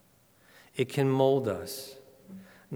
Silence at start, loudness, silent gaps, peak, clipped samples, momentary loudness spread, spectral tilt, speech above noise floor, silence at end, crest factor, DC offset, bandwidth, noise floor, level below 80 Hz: 0.75 s; -29 LUFS; none; -10 dBFS; under 0.1%; 25 LU; -6.5 dB/octave; 35 dB; 0 s; 20 dB; under 0.1%; over 20 kHz; -63 dBFS; -72 dBFS